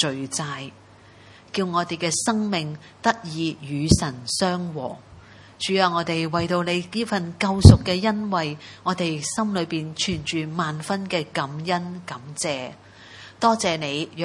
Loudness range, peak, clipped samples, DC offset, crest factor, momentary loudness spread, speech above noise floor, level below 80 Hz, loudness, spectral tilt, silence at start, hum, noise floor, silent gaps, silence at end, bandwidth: 7 LU; 0 dBFS; under 0.1%; under 0.1%; 24 dB; 11 LU; 26 dB; -40 dBFS; -23 LUFS; -5 dB/octave; 0 s; none; -49 dBFS; none; 0 s; 11.5 kHz